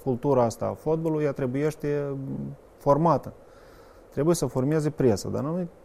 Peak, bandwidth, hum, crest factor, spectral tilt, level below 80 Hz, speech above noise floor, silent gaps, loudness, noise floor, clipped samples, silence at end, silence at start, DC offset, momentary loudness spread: -8 dBFS; 15.5 kHz; none; 18 dB; -7 dB/octave; -52 dBFS; 25 dB; none; -26 LUFS; -50 dBFS; under 0.1%; 0.15 s; 0 s; under 0.1%; 10 LU